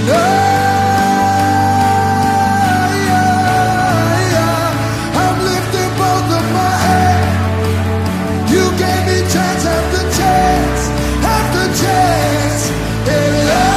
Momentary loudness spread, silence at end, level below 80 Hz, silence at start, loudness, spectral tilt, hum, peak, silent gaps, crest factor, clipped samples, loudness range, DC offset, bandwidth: 4 LU; 0 s; -28 dBFS; 0 s; -13 LUFS; -5 dB/octave; none; 0 dBFS; none; 12 dB; under 0.1%; 2 LU; under 0.1%; 15.5 kHz